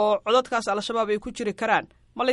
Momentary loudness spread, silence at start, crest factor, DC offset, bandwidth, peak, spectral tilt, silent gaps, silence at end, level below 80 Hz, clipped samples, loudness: 6 LU; 0 s; 18 dB; under 0.1%; 11.5 kHz; -8 dBFS; -3.5 dB/octave; none; 0 s; -56 dBFS; under 0.1%; -25 LUFS